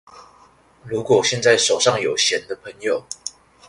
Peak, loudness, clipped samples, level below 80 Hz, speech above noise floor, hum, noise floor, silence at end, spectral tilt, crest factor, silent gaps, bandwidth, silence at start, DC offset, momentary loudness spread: -2 dBFS; -18 LUFS; under 0.1%; -58 dBFS; 33 dB; none; -52 dBFS; 0.4 s; -2 dB/octave; 18 dB; none; 11.5 kHz; 0.15 s; under 0.1%; 16 LU